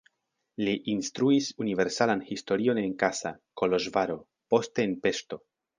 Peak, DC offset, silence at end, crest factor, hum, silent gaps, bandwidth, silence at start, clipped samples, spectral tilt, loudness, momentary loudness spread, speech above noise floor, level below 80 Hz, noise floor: -8 dBFS; under 0.1%; 0.4 s; 20 dB; none; none; 9.8 kHz; 0.6 s; under 0.1%; -4.5 dB/octave; -28 LUFS; 10 LU; 52 dB; -66 dBFS; -80 dBFS